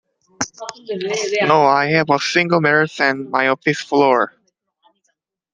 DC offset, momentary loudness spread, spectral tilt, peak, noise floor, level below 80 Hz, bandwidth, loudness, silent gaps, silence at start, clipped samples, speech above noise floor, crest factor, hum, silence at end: under 0.1%; 12 LU; -4.5 dB/octave; 0 dBFS; -70 dBFS; -64 dBFS; 9.8 kHz; -17 LUFS; none; 0.4 s; under 0.1%; 53 dB; 18 dB; none; 1.25 s